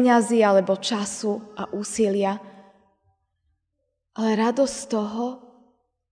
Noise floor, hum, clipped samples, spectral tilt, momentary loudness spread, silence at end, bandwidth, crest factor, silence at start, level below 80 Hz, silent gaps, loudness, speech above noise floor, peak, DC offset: -77 dBFS; none; under 0.1%; -4.5 dB/octave; 14 LU; 0.7 s; 10 kHz; 18 dB; 0 s; -66 dBFS; none; -23 LUFS; 55 dB; -6 dBFS; under 0.1%